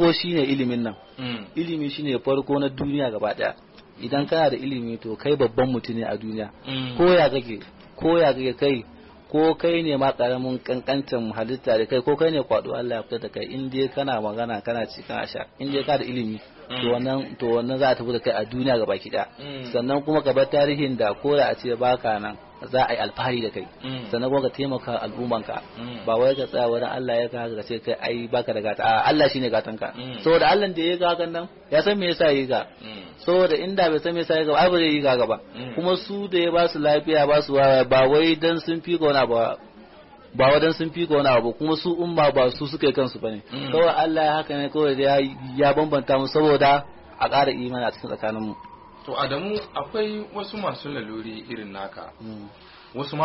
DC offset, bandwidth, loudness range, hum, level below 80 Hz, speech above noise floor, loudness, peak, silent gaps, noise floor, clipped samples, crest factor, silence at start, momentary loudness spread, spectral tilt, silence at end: under 0.1%; 6 kHz; 6 LU; none; -54 dBFS; 25 dB; -23 LUFS; -8 dBFS; none; -47 dBFS; under 0.1%; 14 dB; 0 s; 13 LU; -3.5 dB/octave; 0 s